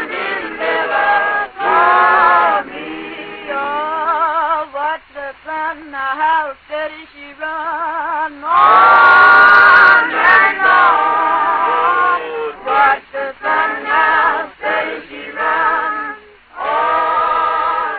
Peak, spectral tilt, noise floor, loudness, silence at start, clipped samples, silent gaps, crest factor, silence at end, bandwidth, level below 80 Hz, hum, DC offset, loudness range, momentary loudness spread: 0 dBFS; -5 dB/octave; -35 dBFS; -12 LUFS; 0 s; 0.1%; none; 14 dB; 0 s; 5.4 kHz; -52 dBFS; none; under 0.1%; 12 LU; 18 LU